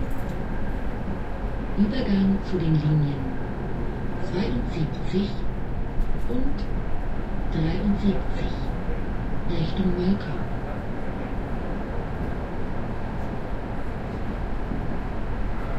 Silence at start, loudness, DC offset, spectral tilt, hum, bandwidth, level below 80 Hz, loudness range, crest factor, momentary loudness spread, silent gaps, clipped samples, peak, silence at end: 0 s; -28 LUFS; under 0.1%; -8.5 dB/octave; none; 6 kHz; -30 dBFS; 6 LU; 16 dB; 9 LU; none; under 0.1%; -10 dBFS; 0 s